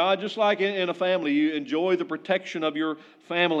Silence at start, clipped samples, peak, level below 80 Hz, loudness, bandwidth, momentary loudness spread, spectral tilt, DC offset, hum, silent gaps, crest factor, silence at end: 0 s; under 0.1%; -10 dBFS; under -90 dBFS; -25 LUFS; 7.8 kHz; 6 LU; -5.5 dB/octave; under 0.1%; none; none; 16 dB; 0 s